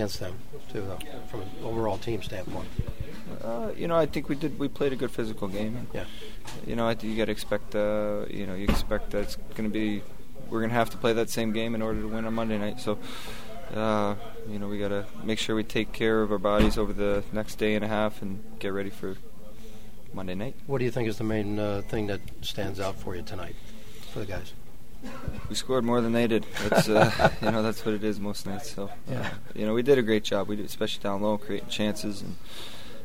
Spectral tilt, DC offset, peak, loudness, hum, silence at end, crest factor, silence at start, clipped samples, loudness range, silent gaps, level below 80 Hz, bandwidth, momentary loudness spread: -5.5 dB/octave; 3%; -4 dBFS; -29 LUFS; none; 0 s; 24 dB; 0 s; under 0.1%; 8 LU; none; -42 dBFS; 16 kHz; 15 LU